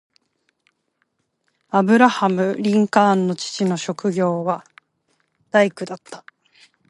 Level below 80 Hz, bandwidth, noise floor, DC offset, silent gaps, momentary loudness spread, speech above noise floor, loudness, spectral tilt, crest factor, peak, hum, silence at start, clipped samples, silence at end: -72 dBFS; 11.5 kHz; -71 dBFS; under 0.1%; none; 17 LU; 53 dB; -19 LUFS; -5.5 dB/octave; 20 dB; 0 dBFS; none; 1.75 s; under 0.1%; 0.7 s